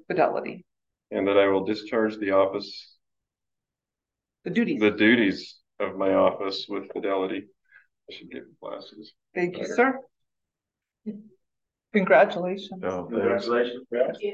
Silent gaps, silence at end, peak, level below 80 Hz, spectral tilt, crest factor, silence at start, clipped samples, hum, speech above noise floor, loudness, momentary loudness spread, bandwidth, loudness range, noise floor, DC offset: none; 0 s; -6 dBFS; -66 dBFS; -6 dB/octave; 20 dB; 0.1 s; under 0.1%; none; 64 dB; -24 LUFS; 21 LU; 7.6 kHz; 6 LU; -89 dBFS; under 0.1%